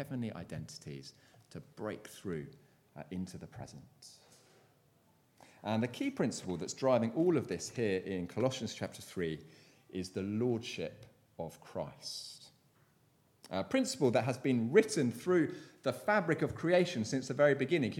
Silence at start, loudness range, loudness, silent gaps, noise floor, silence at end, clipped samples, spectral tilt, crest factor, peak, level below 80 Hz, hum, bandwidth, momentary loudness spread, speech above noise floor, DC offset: 0 s; 14 LU; -35 LUFS; none; -70 dBFS; 0 s; under 0.1%; -5.5 dB/octave; 24 dB; -12 dBFS; -70 dBFS; none; 16.5 kHz; 19 LU; 35 dB; under 0.1%